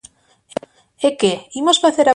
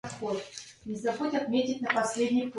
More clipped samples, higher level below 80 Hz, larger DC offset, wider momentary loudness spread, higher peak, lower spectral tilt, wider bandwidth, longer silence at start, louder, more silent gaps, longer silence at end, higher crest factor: neither; first, -62 dBFS vs -68 dBFS; neither; first, 17 LU vs 12 LU; first, -2 dBFS vs -12 dBFS; about the same, -3 dB/octave vs -4 dB/octave; about the same, 11.5 kHz vs 11.5 kHz; first, 1 s vs 0.05 s; first, -16 LUFS vs -30 LUFS; neither; about the same, 0 s vs 0 s; about the same, 16 dB vs 18 dB